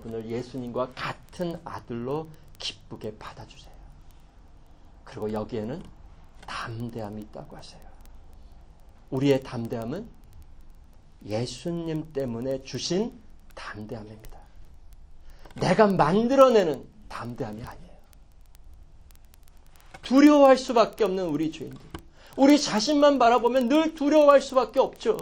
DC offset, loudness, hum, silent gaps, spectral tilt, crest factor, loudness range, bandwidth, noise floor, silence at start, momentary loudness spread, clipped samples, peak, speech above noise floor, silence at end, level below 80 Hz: under 0.1%; -24 LUFS; none; none; -5.5 dB/octave; 22 dB; 17 LU; 16.5 kHz; -50 dBFS; 0 s; 22 LU; under 0.1%; -4 dBFS; 26 dB; 0 s; -50 dBFS